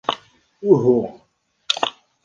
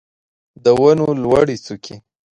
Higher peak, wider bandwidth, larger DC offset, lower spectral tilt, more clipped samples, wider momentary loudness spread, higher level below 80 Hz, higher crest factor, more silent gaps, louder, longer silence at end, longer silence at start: about the same, -2 dBFS vs 0 dBFS; second, 9.6 kHz vs 11 kHz; neither; second, -5.5 dB/octave vs -7 dB/octave; neither; second, 15 LU vs 19 LU; second, -62 dBFS vs -48 dBFS; about the same, 20 dB vs 16 dB; neither; second, -19 LUFS vs -15 LUFS; about the same, 0.35 s vs 0.4 s; second, 0.1 s vs 0.65 s